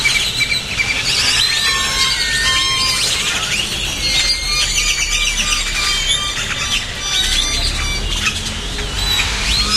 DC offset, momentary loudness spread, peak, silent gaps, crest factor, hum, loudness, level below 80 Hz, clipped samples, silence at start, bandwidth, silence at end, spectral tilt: under 0.1%; 5 LU; 0 dBFS; none; 16 dB; none; -15 LUFS; -28 dBFS; under 0.1%; 0 s; 16 kHz; 0 s; -0.5 dB/octave